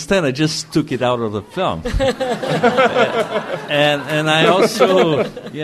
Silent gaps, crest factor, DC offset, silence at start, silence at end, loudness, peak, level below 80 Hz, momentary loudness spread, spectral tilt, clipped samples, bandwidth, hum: none; 16 dB; under 0.1%; 0 s; 0 s; -16 LUFS; 0 dBFS; -36 dBFS; 8 LU; -5 dB/octave; under 0.1%; 13.5 kHz; none